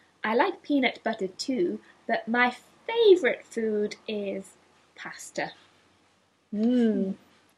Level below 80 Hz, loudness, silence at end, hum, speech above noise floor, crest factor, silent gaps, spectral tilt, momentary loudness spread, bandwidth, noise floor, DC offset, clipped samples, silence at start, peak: -78 dBFS; -27 LUFS; 0.4 s; none; 40 dB; 20 dB; none; -5 dB/octave; 16 LU; 12.5 kHz; -66 dBFS; under 0.1%; under 0.1%; 0.25 s; -6 dBFS